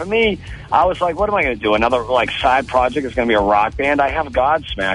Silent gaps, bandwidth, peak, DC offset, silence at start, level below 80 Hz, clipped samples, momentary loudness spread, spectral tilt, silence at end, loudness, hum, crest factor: none; 11 kHz; -4 dBFS; under 0.1%; 0 s; -36 dBFS; under 0.1%; 4 LU; -5.5 dB/octave; 0 s; -17 LUFS; none; 14 dB